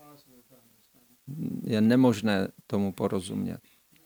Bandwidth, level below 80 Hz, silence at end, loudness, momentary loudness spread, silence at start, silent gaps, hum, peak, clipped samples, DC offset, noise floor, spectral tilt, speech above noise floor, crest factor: over 20 kHz; -72 dBFS; 0.45 s; -27 LUFS; 15 LU; 1.25 s; none; none; -10 dBFS; under 0.1%; under 0.1%; -62 dBFS; -6.5 dB/octave; 36 dB; 20 dB